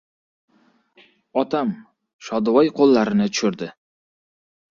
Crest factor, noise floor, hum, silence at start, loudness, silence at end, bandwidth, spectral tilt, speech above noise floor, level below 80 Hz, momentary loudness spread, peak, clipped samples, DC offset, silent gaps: 18 dB; -60 dBFS; none; 1.35 s; -20 LUFS; 1 s; 7.4 kHz; -5.5 dB/octave; 41 dB; -62 dBFS; 18 LU; -4 dBFS; under 0.1%; under 0.1%; 2.13-2.19 s